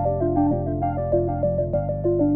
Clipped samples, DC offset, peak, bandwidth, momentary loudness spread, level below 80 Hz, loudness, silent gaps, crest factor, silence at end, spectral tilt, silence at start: under 0.1%; under 0.1%; -10 dBFS; 3 kHz; 3 LU; -36 dBFS; -23 LUFS; none; 12 dB; 0 s; -14 dB/octave; 0 s